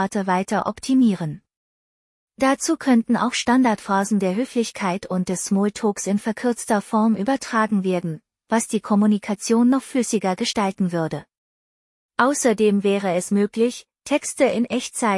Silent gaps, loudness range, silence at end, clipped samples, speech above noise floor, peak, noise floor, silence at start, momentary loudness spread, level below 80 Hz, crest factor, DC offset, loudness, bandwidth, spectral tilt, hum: 1.57-2.28 s, 11.37-12.09 s; 2 LU; 0 s; under 0.1%; over 70 dB; -4 dBFS; under -90 dBFS; 0 s; 6 LU; -62 dBFS; 18 dB; under 0.1%; -21 LUFS; 12 kHz; -5 dB/octave; none